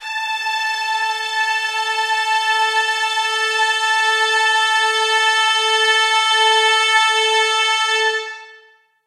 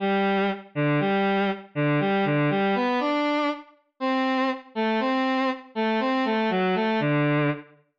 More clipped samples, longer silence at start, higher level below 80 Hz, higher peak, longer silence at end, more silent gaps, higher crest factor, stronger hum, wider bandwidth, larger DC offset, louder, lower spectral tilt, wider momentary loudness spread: neither; about the same, 0 s vs 0 s; second, -82 dBFS vs -76 dBFS; first, -2 dBFS vs -16 dBFS; first, 0.5 s vs 0.35 s; neither; first, 14 dB vs 8 dB; neither; first, 15 kHz vs 7.4 kHz; neither; first, -15 LUFS vs -24 LUFS; second, 5 dB/octave vs -7.5 dB/octave; about the same, 6 LU vs 5 LU